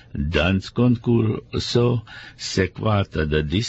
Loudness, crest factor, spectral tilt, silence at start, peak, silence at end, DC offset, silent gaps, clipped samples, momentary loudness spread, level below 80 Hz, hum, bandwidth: -22 LUFS; 16 dB; -6 dB/octave; 0.15 s; -6 dBFS; 0 s; under 0.1%; none; under 0.1%; 6 LU; -36 dBFS; none; 8.2 kHz